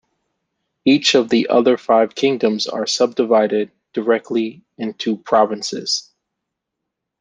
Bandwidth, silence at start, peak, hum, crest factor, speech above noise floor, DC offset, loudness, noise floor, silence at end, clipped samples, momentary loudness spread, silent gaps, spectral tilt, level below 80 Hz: 9.8 kHz; 0.85 s; -2 dBFS; none; 16 dB; 63 dB; under 0.1%; -17 LUFS; -80 dBFS; 1.2 s; under 0.1%; 9 LU; none; -3.5 dB/octave; -66 dBFS